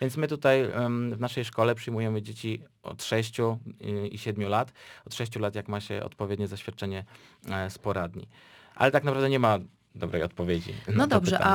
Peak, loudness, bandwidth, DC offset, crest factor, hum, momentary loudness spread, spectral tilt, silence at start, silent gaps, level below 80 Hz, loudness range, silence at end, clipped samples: -4 dBFS; -29 LUFS; over 20 kHz; under 0.1%; 24 dB; none; 13 LU; -6 dB/octave; 0 s; none; -58 dBFS; 6 LU; 0 s; under 0.1%